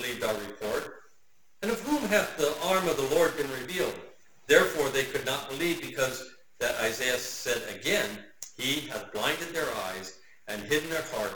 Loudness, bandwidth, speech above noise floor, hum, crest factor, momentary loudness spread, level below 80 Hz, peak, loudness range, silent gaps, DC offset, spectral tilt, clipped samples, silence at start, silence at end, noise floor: -29 LUFS; 19 kHz; 41 dB; none; 24 dB; 12 LU; -60 dBFS; -6 dBFS; 4 LU; none; under 0.1%; -3 dB/octave; under 0.1%; 0 s; 0 s; -70 dBFS